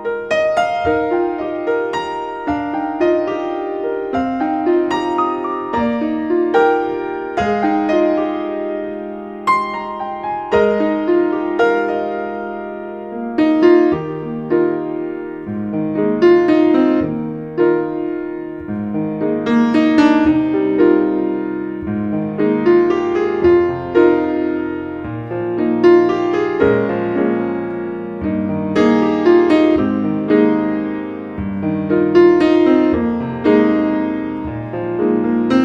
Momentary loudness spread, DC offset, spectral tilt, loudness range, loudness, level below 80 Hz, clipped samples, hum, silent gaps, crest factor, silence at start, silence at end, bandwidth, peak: 12 LU; under 0.1%; -7.5 dB/octave; 4 LU; -16 LUFS; -46 dBFS; under 0.1%; none; none; 16 dB; 0 s; 0 s; 7.6 kHz; 0 dBFS